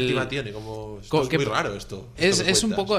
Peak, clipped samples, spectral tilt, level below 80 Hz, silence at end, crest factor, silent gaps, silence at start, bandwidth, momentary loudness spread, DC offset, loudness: -4 dBFS; under 0.1%; -3.5 dB/octave; -46 dBFS; 0 s; 20 dB; none; 0 s; 15.5 kHz; 16 LU; under 0.1%; -23 LUFS